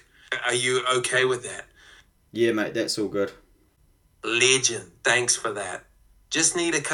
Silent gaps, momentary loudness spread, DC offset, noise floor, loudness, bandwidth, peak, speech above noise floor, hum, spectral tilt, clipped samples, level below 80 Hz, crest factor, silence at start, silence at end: none; 14 LU; under 0.1%; -62 dBFS; -23 LUFS; 15 kHz; -4 dBFS; 37 dB; none; -2 dB/octave; under 0.1%; -62 dBFS; 22 dB; 0.3 s; 0 s